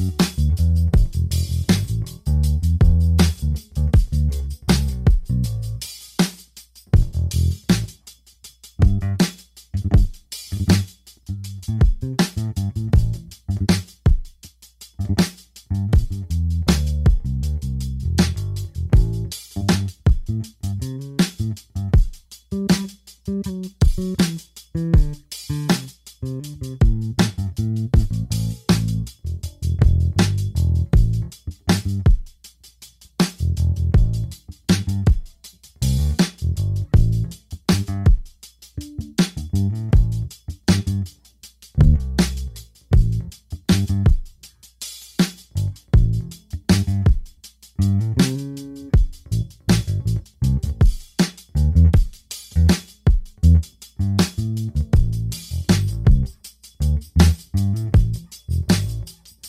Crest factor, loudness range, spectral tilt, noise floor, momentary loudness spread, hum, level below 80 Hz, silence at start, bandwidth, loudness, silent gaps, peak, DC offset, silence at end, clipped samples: 18 dB; 3 LU; -6 dB/octave; -48 dBFS; 12 LU; none; -24 dBFS; 0 s; 15.5 kHz; -21 LUFS; none; 0 dBFS; under 0.1%; 0 s; under 0.1%